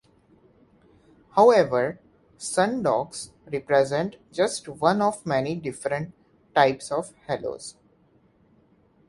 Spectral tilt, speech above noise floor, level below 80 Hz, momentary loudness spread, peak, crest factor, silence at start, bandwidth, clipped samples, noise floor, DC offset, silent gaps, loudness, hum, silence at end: -4.5 dB/octave; 38 dB; -62 dBFS; 15 LU; -4 dBFS; 22 dB; 1.35 s; 11.5 kHz; under 0.1%; -61 dBFS; under 0.1%; none; -24 LUFS; none; 1.35 s